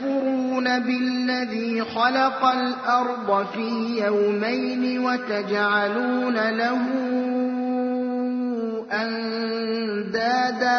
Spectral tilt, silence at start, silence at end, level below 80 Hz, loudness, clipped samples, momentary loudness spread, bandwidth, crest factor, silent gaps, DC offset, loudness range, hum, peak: -5 dB/octave; 0 s; 0 s; -70 dBFS; -23 LUFS; under 0.1%; 5 LU; 6.4 kHz; 16 dB; none; under 0.1%; 3 LU; none; -8 dBFS